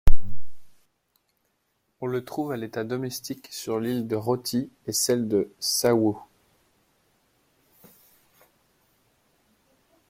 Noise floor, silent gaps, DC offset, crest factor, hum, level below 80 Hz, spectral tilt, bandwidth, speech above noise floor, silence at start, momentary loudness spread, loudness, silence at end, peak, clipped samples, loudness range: -73 dBFS; none; under 0.1%; 22 dB; none; -34 dBFS; -4.5 dB/octave; 16 kHz; 47 dB; 0.05 s; 12 LU; -27 LUFS; 3.9 s; -2 dBFS; under 0.1%; 8 LU